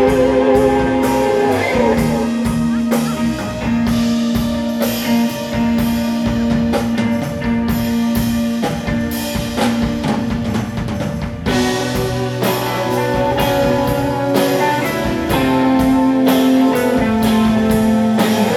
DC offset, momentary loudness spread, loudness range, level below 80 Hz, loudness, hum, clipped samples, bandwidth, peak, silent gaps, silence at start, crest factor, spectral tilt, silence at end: under 0.1%; 6 LU; 4 LU; -32 dBFS; -16 LUFS; none; under 0.1%; 17.5 kHz; -2 dBFS; none; 0 s; 14 dB; -5.5 dB/octave; 0 s